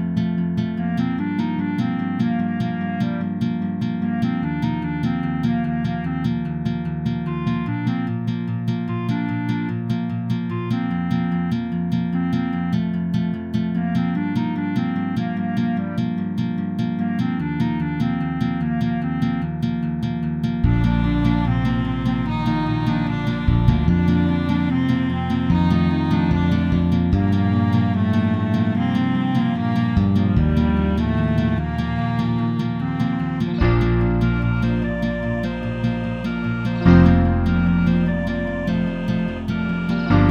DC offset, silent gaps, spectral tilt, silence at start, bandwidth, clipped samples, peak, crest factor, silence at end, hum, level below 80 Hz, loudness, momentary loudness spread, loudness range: under 0.1%; none; -9 dB/octave; 0 s; 6.8 kHz; under 0.1%; -2 dBFS; 18 dB; 0 s; none; -32 dBFS; -21 LUFS; 6 LU; 5 LU